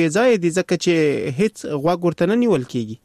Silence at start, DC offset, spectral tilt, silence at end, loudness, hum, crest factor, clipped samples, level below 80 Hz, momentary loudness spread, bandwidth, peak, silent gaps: 0 s; under 0.1%; -6 dB/octave; 0.1 s; -19 LUFS; none; 12 dB; under 0.1%; -58 dBFS; 5 LU; 13 kHz; -6 dBFS; none